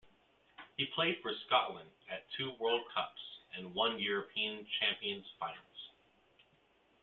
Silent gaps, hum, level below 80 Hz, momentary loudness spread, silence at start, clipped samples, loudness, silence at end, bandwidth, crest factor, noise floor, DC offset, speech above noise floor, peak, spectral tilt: none; none; -80 dBFS; 17 LU; 0.05 s; under 0.1%; -37 LUFS; 1.15 s; 4.5 kHz; 24 dB; -71 dBFS; under 0.1%; 34 dB; -16 dBFS; -0.5 dB/octave